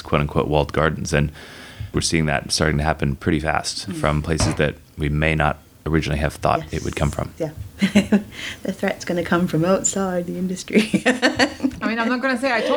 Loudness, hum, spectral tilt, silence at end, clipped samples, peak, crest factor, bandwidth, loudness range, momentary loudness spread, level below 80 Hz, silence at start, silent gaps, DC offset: -21 LUFS; none; -5 dB/octave; 0 s; under 0.1%; -2 dBFS; 20 dB; over 20 kHz; 2 LU; 9 LU; -34 dBFS; 0 s; none; under 0.1%